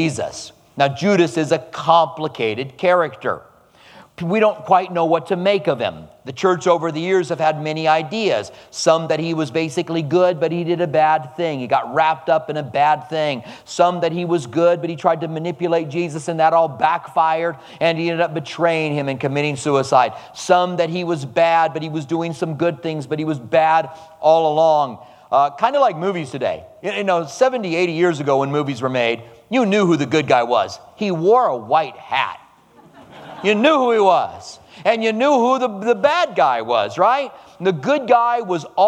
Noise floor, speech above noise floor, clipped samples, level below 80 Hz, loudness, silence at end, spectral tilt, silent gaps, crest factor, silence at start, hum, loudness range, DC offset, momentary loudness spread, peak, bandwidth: -49 dBFS; 31 dB; under 0.1%; -64 dBFS; -18 LUFS; 0 s; -5.5 dB/octave; none; 18 dB; 0 s; none; 2 LU; under 0.1%; 8 LU; 0 dBFS; 11.5 kHz